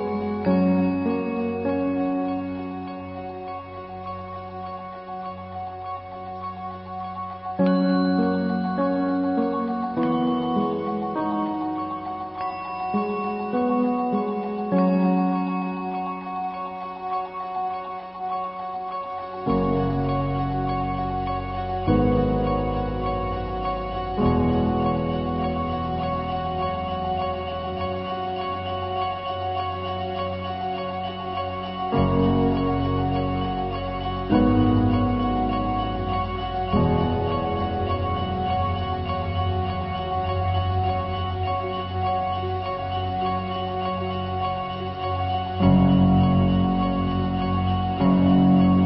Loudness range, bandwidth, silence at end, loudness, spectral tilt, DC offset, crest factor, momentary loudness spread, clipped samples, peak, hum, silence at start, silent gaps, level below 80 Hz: 7 LU; 5.6 kHz; 0 s; -25 LUFS; -12 dB/octave; under 0.1%; 16 dB; 12 LU; under 0.1%; -8 dBFS; none; 0 s; none; -36 dBFS